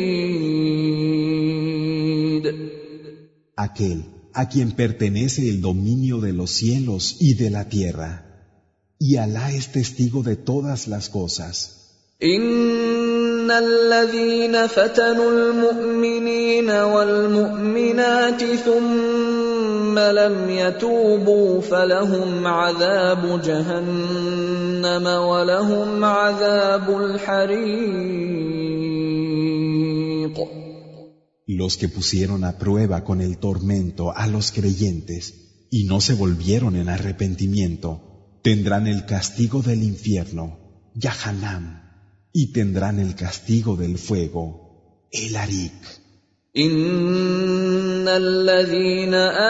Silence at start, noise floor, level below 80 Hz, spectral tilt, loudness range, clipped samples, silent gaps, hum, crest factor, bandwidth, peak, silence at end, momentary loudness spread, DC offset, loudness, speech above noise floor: 0 s; -62 dBFS; -46 dBFS; -5.5 dB/octave; 6 LU; under 0.1%; none; none; 16 dB; 8 kHz; -4 dBFS; 0 s; 11 LU; under 0.1%; -20 LUFS; 42 dB